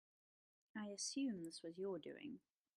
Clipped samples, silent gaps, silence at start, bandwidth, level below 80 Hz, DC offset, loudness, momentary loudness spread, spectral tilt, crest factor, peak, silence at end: under 0.1%; none; 0.75 s; 13.5 kHz; under -90 dBFS; under 0.1%; -48 LUFS; 13 LU; -3.5 dB/octave; 16 dB; -34 dBFS; 0.4 s